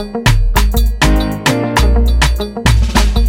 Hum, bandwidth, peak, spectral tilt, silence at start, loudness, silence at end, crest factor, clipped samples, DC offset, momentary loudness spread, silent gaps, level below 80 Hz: none; 17 kHz; 0 dBFS; -5 dB/octave; 0 s; -13 LUFS; 0 s; 10 dB; under 0.1%; under 0.1%; 2 LU; none; -12 dBFS